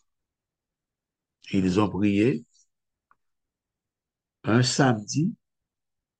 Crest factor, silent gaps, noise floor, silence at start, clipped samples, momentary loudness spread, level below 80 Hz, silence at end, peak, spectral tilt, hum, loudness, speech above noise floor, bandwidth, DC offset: 22 dB; none; -89 dBFS; 1.45 s; under 0.1%; 8 LU; -64 dBFS; 0.85 s; -6 dBFS; -5.5 dB/octave; none; -24 LUFS; 66 dB; 9.6 kHz; under 0.1%